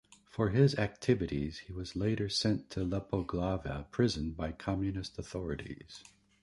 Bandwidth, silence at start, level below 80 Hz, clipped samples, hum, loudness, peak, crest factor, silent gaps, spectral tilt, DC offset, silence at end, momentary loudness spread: 11.5 kHz; 0.35 s; -50 dBFS; under 0.1%; none; -34 LUFS; -14 dBFS; 20 dB; none; -6 dB/octave; under 0.1%; 0.4 s; 13 LU